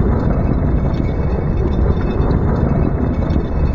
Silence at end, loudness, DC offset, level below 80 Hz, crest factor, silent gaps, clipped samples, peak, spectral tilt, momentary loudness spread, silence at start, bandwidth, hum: 0 s; -17 LUFS; under 0.1%; -18 dBFS; 14 dB; none; under 0.1%; -2 dBFS; -10.5 dB/octave; 2 LU; 0 s; 5.8 kHz; none